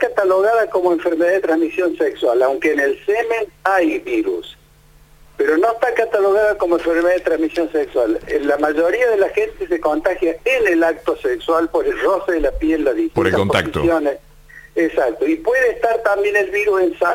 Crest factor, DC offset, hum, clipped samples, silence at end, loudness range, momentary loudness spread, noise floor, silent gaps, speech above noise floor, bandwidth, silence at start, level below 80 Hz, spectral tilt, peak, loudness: 16 dB; under 0.1%; none; under 0.1%; 0 s; 2 LU; 5 LU; -48 dBFS; none; 32 dB; 16.5 kHz; 0 s; -42 dBFS; -5.5 dB/octave; -2 dBFS; -17 LUFS